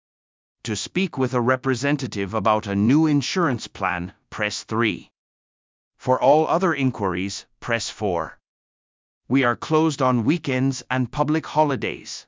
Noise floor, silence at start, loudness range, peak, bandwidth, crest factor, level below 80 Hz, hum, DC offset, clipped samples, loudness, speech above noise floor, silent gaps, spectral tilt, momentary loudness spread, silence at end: under -90 dBFS; 0.65 s; 3 LU; -4 dBFS; 7.6 kHz; 18 dB; -52 dBFS; none; under 0.1%; under 0.1%; -22 LUFS; over 68 dB; 5.18-5.91 s, 8.48-9.21 s; -5.5 dB/octave; 10 LU; 0.05 s